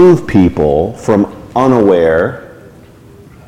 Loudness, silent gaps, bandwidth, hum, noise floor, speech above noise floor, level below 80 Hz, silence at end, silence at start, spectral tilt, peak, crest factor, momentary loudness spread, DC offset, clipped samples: -11 LUFS; none; 10.5 kHz; none; -38 dBFS; 28 dB; -34 dBFS; 0.95 s; 0 s; -8 dB/octave; 0 dBFS; 12 dB; 7 LU; under 0.1%; under 0.1%